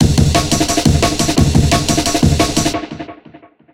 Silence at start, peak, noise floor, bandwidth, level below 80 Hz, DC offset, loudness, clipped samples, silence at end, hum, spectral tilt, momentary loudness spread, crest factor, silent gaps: 0 s; 0 dBFS; -42 dBFS; 17 kHz; -24 dBFS; 1%; -13 LUFS; under 0.1%; 0.35 s; none; -4.5 dB/octave; 11 LU; 14 dB; none